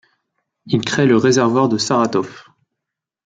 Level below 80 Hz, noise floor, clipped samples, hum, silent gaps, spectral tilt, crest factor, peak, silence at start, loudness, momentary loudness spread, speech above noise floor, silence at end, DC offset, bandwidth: -58 dBFS; -82 dBFS; under 0.1%; none; none; -5 dB/octave; 16 dB; -2 dBFS; 0.65 s; -16 LUFS; 9 LU; 67 dB; 0.85 s; under 0.1%; 9.4 kHz